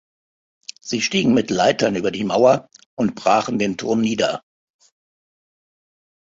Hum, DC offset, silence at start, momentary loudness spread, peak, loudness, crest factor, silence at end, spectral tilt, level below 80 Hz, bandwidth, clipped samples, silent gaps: none; under 0.1%; 0.85 s; 15 LU; -2 dBFS; -19 LUFS; 20 dB; 1.8 s; -4.5 dB/octave; -58 dBFS; 7.8 kHz; under 0.1%; 2.86-2.97 s